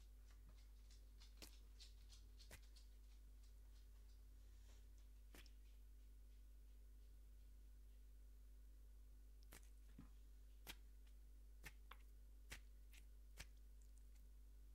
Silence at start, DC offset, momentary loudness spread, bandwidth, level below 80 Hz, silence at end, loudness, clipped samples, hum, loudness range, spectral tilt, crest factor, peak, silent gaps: 0 s; under 0.1%; 5 LU; 16 kHz; -64 dBFS; 0 s; -66 LUFS; under 0.1%; 50 Hz at -65 dBFS; 3 LU; -3.5 dB/octave; 24 dB; -40 dBFS; none